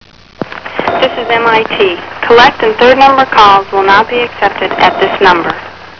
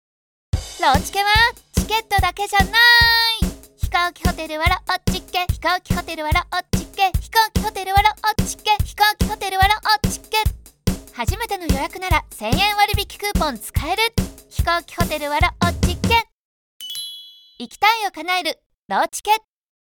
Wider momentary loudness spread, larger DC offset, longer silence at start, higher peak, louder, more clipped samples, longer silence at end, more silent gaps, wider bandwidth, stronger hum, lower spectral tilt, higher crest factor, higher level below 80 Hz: about the same, 12 LU vs 10 LU; first, 0.7% vs under 0.1%; second, 0.4 s vs 0.55 s; about the same, 0 dBFS vs -2 dBFS; first, -8 LUFS vs -19 LUFS; first, 3% vs under 0.1%; second, 0.1 s vs 0.55 s; second, none vs 16.32-16.80 s, 18.66-18.70 s, 18.82-18.89 s; second, 5.4 kHz vs 19.5 kHz; neither; about the same, -4.5 dB/octave vs -3.5 dB/octave; second, 8 dB vs 18 dB; second, -40 dBFS vs -30 dBFS